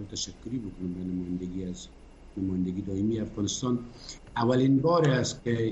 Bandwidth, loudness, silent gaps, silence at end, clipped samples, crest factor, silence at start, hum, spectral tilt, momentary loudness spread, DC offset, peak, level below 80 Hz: 8.4 kHz; -29 LUFS; none; 0 s; under 0.1%; 16 dB; 0 s; none; -5.5 dB/octave; 15 LU; under 0.1%; -12 dBFS; -52 dBFS